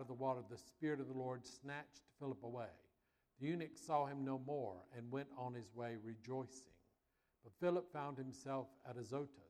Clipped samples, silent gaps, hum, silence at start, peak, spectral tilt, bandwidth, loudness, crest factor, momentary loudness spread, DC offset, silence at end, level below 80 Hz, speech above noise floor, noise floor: under 0.1%; none; none; 0 s; -26 dBFS; -6.5 dB/octave; 14.5 kHz; -47 LUFS; 20 dB; 11 LU; under 0.1%; 0 s; -82 dBFS; 39 dB; -85 dBFS